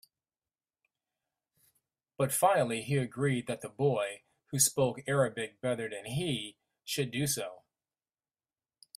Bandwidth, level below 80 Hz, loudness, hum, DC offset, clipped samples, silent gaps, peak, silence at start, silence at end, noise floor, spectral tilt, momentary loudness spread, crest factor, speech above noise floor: 15.5 kHz; -70 dBFS; -31 LUFS; none; under 0.1%; under 0.1%; none; -10 dBFS; 2.2 s; 1.4 s; under -90 dBFS; -4 dB/octave; 12 LU; 24 dB; over 59 dB